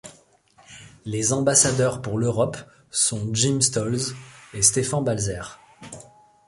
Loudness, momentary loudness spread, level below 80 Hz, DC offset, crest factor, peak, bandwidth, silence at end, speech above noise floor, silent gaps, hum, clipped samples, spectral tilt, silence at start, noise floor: -21 LUFS; 22 LU; -52 dBFS; under 0.1%; 22 dB; -2 dBFS; 11.5 kHz; 0.45 s; 34 dB; none; none; under 0.1%; -3.5 dB/octave; 0.05 s; -56 dBFS